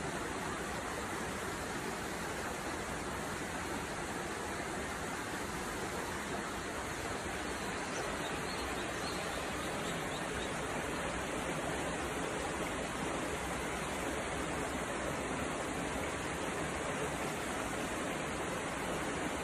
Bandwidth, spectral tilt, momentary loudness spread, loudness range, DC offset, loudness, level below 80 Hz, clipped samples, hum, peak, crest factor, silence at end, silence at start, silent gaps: 14.5 kHz; -3.5 dB/octave; 2 LU; 2 LU; under 0.1%; -38 LUFS; -54 dBFS; under 0.1%; none; -24 dBFS; 14 dB; 0 s; 0 s; none